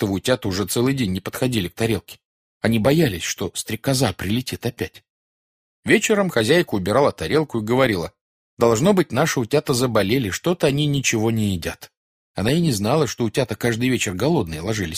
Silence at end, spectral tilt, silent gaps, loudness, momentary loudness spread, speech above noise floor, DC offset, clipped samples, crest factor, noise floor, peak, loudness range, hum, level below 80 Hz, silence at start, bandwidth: 0 s; -5 dB/octave; 2.25-2.60 s, 5.10-5.83 s, 8.21-8.57 s, 11.97-12.34 s; -20 LUFS; 8 LU; over 70 dB; under 0.1%; under 0.1%; 18 dB; under -90 dBFS; -2 dBFS; 3 LU; none; -48 dBFS; 0 s; 15.5 kHz